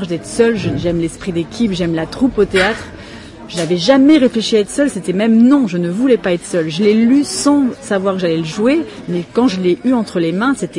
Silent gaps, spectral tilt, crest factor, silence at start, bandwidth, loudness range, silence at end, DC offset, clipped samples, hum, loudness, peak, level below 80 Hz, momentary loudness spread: none; -5.5 dB/octave; 14 dB; 0 s; 11.5 kHz; 4 LU; 0 s; under 0.1%; under 0.1%; none; -14 LUFS; 0 dBFS; -42 dBFS; 11 LU